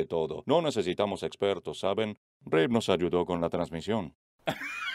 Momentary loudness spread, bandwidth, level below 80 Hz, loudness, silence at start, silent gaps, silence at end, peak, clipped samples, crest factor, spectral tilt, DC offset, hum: 9 LU; 15 kHz; -60 dBFS; -30 LUFS; 0 s; 2.17-2.40 s, 4.15-4.38 s; 0 s; -8 dBFS; under 0.1%; 20 dB; -5.5 dB/octave; under 0.1%; none